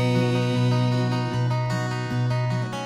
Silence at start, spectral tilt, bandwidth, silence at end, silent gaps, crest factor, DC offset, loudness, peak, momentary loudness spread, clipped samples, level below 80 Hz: 0 s; -7 dB/octave; 11.5 kHz; 0 s; none; 14 dB; under 0.1%; -24 LUFS; -10 dBFS; 4 LU; under 0.1%; -54 dBFS